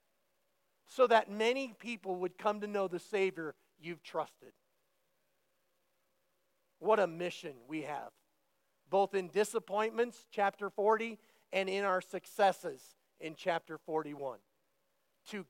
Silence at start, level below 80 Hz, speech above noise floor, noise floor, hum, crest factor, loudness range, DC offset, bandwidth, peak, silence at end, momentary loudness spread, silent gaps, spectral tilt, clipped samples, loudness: 0.9 s; under -90 dBFS; 46 dB; -80 dBFS; none; 22 dB; 6 LU; under 0.1%; 16.5 kHz; -14 dBFS; 0.05 s; 15 LU; none; -4.5 dB/octave; under 0.1%; -35 LUFS